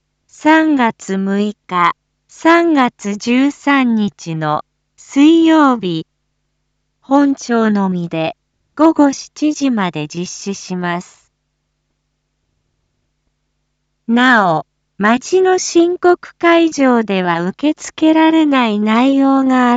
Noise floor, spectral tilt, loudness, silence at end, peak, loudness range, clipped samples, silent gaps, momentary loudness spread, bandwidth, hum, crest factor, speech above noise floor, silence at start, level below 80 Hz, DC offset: -68 dBFS; -5 dB/octave; -14 LUFS; 0 s; 0 dBFS; 9 LU; under 0.1%; none; 11 LU; 8 kHz; none; 14 dB; 56 dB; 0.45 s; -62 dBFS; under 0.1%